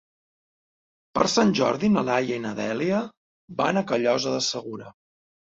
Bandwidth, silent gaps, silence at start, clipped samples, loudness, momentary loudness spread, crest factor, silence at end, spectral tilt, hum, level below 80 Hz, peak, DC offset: 7.8 kHz; 3.17-3.48 s; 1.15 s; under 0.1%; -24 LUFS; 13 LU; 22 dB; 0.6 s; -4.5 dB/octave; none; -62 dBFS; -4 dBFS; under 0.1%